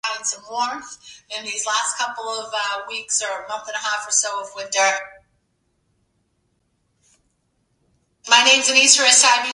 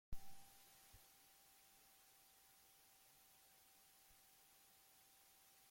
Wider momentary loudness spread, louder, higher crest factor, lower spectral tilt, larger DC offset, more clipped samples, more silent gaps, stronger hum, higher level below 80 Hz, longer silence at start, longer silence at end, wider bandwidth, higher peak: first, 17 LU vs 3 LU; first, -17 LUFS vs -67 LUFS; about the same, 22 dB vs 22 dB; second, 2.5 dB/octave vs -2 dB/octave; neither; neither; neither; neither; about the same, -70 dBFS vs -68 dBFS; about the same, 0.05 s vs 0.1 s; about the same, 0 s vs 0 s; second, 11.5 kHz vs 16.5 kHz; first, 0 dBFS vs -36 dBFS